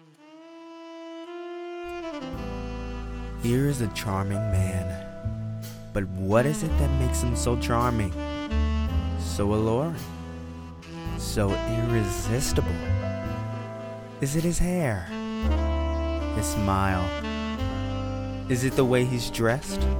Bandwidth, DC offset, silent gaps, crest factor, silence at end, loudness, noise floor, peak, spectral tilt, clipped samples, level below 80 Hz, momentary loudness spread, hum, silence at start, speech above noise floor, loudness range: 19 kHz; under 0.1%; none; 20 dB; 0 s; -27 LUFS; -49 dBFS; -8 dBFS; -6 dB/octave; under 0.1%; -34 dBFS; 13 LU; none; 0.25 s; 25 dB; 3 LU